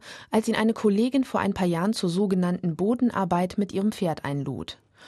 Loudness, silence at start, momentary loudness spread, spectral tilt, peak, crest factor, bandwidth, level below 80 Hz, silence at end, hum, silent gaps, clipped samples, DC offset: -25 LUFS; 0.05 s; 7 LU; -6.5 dB/octave; -10 dBFS; 14 dB; 12.5 kHz; -58 dBFS; 0 s; none; none; under 0.1%; under 0.1%